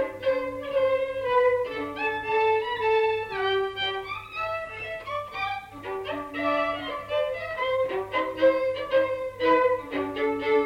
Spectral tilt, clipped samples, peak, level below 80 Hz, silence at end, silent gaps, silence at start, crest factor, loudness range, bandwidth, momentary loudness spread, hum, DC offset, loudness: -5 dB/octave; under 0.1%; -10 dBFS; -56 dBFS; 0 s; none; 0 s; 16 dB; 5 LU; 11.5 kHz; 10 LU; 50 Hz at -55 dBFS; under 0.1%; -26 LUFS